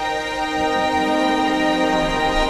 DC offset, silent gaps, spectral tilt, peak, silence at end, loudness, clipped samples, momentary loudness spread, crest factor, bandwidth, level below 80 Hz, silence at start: under 0.1%; none; -4 dB/octave; -6 dBFS; 0 s; -19 LUFS; under 0.1%; 4 LU; 14 dB; 13.5 kHz; -34 dBFS; 0 s